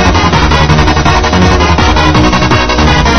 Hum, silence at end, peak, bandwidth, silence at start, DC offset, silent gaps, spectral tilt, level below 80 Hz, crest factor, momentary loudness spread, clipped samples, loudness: none; 0 s; 0 dBFS; 8.6 kHz; 0 s; 6%; none; -5 dB/octave; -14 dBFS; 8 dB; 1 LU; 1%; -7 LUFS